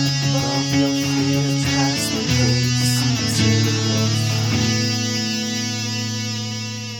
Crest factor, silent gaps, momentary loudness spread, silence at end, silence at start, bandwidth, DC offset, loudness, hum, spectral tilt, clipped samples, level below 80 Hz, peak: 14 dB; none; 6 LU; 0 s; 0 s; 18 kHz; under 0.1%; -19 LUFS; none; -4 dB/octave; under 0.1%; -46 dBFS; -4 dBFS